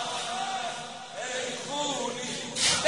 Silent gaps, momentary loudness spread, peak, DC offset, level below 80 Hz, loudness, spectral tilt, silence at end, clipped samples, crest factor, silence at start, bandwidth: none; 9 LU; -10 dBFS; 0.1%; -66 dBFS; -31 LUFS; -1 dB/octave; 0 s; under 0.1%; 22 dB; 0 s; 11 kHz